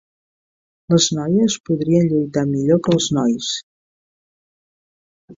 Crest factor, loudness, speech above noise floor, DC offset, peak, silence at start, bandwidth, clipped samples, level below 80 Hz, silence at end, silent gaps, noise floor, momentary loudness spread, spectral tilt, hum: 16 dB; -18 LUFS; over 73 dB; under 0.1%; -4 dBFS; 0.9 s; 7.8 kHz; under 0.1%; -56 dBFS; 0.05 s; 1.60-1.64 s, 3.63-5.28 s; under -90 dBFS; 5 LU; -5.5 dB/octave; none